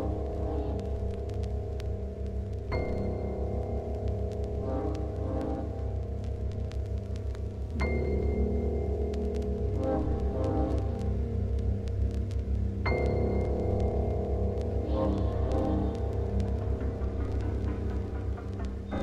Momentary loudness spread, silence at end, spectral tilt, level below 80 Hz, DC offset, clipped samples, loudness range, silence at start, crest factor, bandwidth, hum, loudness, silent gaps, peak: 6 LU; 0 s; -9 dB/octave; -34 dBFS; under 0.1%; under 0.1%; 4 LU; 0 s; 16 dB; 7.4 kHz; none; -32 LUFS; none; -16 dBFS